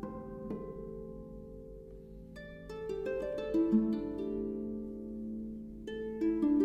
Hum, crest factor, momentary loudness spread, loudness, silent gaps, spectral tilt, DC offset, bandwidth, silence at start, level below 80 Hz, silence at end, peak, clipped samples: none; 18 dB; 19 LU; -37 LUFS; none; -8.5 dB/octave; under 0.1%; 8.4 kHz; 0 s; -54 dBFS; 0 s; -18 dBFS; under 0.1%